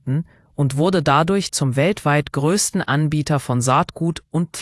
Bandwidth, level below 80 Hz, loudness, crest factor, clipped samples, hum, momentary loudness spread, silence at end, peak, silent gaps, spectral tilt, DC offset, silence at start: 12 kHz; -48 dBFS; -19 LUFS; 18 dB; under 0.1%; none; 8 LU; 0 s; -2 dBFS; none; -5 dB/octave; under 0.1%; 0.05 s